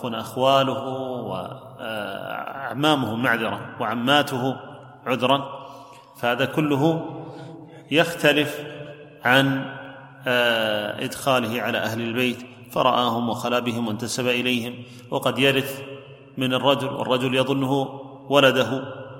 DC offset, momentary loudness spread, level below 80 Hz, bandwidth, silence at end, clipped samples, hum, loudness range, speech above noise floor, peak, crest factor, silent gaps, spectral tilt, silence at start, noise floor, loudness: under 0.1%; 17 LU; -64 dBFS; 16.5 kHz; 0 s; under 0.1%; none; 2 LU; 21 dB; -2 dBFS; 22 dB; none; -5 dB/octave; 0 s; -44 dBFS; -22 LUFS